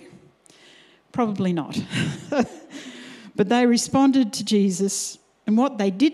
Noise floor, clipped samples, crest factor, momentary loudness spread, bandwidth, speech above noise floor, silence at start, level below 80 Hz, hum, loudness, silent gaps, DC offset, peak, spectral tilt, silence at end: -53 dBFS; under 0.1%; 18 dB; 16 LU; 14 kHz; 32 dB; 1.15 s; -62 dBFS; none; -22 LUFS; none; under 0.1%; -4 dBFS; -5 dB/octave; 0 s